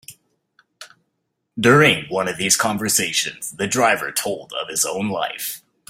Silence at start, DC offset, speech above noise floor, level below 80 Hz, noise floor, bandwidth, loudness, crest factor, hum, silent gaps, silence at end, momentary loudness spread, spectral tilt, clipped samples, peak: 0.1 s; under 0.1%; 55 dB; -58 dBFS; -74 dBFS; 16 kHz; -19 LUFS; 20 dB; none; none; 0.3 s; 12 LU; -3 dB/octave; under 0.1%; 0 dBFS